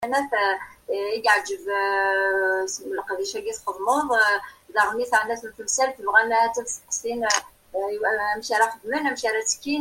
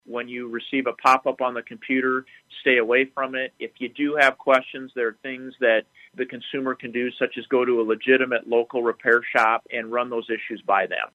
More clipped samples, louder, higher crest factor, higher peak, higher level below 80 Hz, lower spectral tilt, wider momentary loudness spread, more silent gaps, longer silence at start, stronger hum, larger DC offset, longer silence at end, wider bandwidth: neither; about the same, -23 LUFS vs -23 LUFS; about the same, 20 dB vs 20 dB; about the same, -4 dBFS vs -4 dBFS; first, -62 dBFS vs -74 dBFS; second, -0.5 dB/octave vs -4.5 dB/octave; about the same, 10 LU vs 12 LU; neither; about the same, 0 s vs 0.1 s; neither; neither; about the same, 0 s vs 0.05 s; first, 16.5 kHz vs 13 kHz